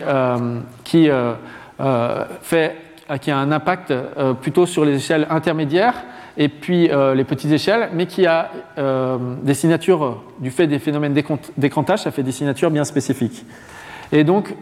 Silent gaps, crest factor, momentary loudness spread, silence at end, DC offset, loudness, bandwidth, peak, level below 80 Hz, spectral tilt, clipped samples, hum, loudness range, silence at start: none; 16 dB; 10 LU; 0 s; under 0.1%; -19 LUFS; 15.5 kHz; -2 dBFS; -58 dBFS; -6 dB/octave; under 0.1%; none; 2 LU; 0 s